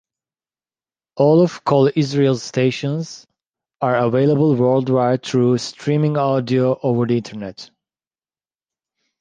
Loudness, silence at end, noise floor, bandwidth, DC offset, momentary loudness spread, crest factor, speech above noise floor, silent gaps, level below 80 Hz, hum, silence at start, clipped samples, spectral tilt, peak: -17 LUFS; 1.55 s; under -90 dBFS; 9.4 kHz; under 0.1%; 9 LU; 16 dB; over 73 dB; none; -60 dBFS; none; 1.15 s; under 0.1%; -7 dB/octave; -2 dBFS